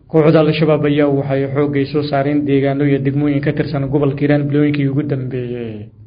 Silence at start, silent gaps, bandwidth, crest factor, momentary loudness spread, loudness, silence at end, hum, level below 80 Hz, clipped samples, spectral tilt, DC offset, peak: 0.15 s; none; 5.2 kHz; 14 dB; 8 LU; -15 LUFS; 0 s; none; -46 dBFS; under 0.1%; -11 dB/octave; under 0.1%; 0 dBFS